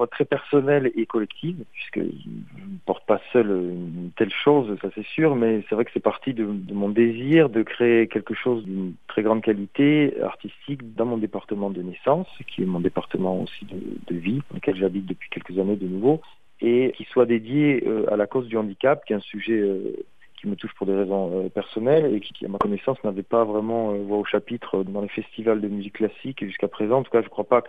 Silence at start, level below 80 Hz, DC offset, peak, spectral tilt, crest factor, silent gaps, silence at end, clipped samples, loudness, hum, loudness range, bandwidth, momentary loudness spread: 0 s; -64 dBFS; 0.4%; -4 dBFS; -9 dB/octave; 20 dB; none; 0 s; under 0.1%; -24 LUFS; none; 5 LU; 4.7 kHz; 12 LU